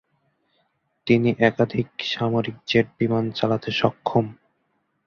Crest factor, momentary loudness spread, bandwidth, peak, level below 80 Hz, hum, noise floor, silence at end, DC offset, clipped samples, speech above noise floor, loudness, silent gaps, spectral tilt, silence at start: 20 dB; 6 LU; 6.8 kHz; -2 dBFS; -58 dBFS; none; -71 dBFS; 0.75 s; under 0.1%; under 0.1%; 49 dB; -22 LUFS; none; -7 dB/octave; 1.05 s